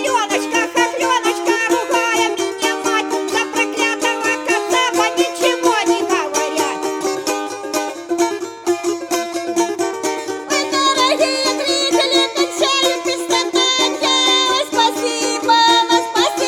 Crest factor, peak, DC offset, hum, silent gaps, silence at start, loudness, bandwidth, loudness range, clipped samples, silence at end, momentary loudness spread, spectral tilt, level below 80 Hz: 16 dB; -2 dBFS; under 0.1%; none; none; 0 s; -16 LUFS; 17 kHz; 6 LU; under 0.1%; 0 s; 7 LU; -1 dB/octave; -70 dBFS